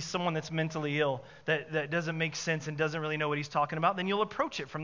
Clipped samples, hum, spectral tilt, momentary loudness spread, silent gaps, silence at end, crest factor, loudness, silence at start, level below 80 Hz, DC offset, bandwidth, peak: under 0.1%; none; -5 dB/octave; 4 LU; none; 0 s; 18 dB; -32 LUFS; 0 s; -70 dBFS; under 0.1%; 7.6 kHz; -14 dBFS